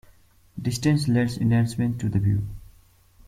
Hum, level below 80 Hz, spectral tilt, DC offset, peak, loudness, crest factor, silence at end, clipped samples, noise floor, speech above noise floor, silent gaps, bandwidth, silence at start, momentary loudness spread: none; -46 dBFS; -6.5 dB/octave; under 0.1%; -8 dBFS; -24 LUFS; 16 dB; 0.65 s; under 0.1%; -55 dBFS; 33 dB; none; 15 kHz; 0.55 s; 10 LU